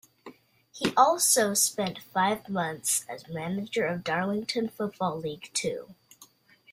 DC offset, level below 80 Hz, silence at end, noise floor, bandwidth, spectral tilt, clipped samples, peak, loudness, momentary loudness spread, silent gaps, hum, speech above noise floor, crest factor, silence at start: under 0.1%; -68 dBFS; 0.5 s; -58 dBFS; 16 kHz; -3 dB/octave; under 0.1%; -6 dBFS; -27 LUFS; 12 LU; none; none; 30 dB; 22 dB; 0.25 s